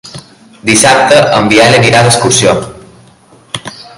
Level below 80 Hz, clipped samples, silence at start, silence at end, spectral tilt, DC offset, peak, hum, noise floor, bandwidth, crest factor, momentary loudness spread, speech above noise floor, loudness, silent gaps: -40 dBFS; 0.9%; 0.05 s; 0.15 s; -3.5 dB/octave; under 0.1%; 0 dBFS; none; -41 dBFS; 16 kHz; 10 dB; 17 LU; 34 dB; -6 LUFS; none